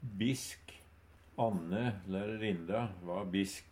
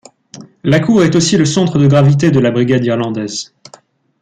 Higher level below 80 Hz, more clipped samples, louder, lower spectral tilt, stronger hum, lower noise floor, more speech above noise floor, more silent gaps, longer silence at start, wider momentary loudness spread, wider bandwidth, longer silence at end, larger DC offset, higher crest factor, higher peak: second, -64 dBFS vs -46 dBFS; neither; second, -37 LUFS vs -12 LUFS; about the same, -5.5 dB/octave vs -6 dB/octave; neither; first, -61 dBFS vs -45 dBFS; second, 25 dB vs 34 dB; neither; second, 0 s vs 0.35 s; about the same, 14 LU vs 12 LU; first, 16.5 kHz vs 9.4 kHz; second, 0 s vs 0.8 s; neither; first, 20 dB vs 12 dB; second, -18 dBFS vs -2 dBFS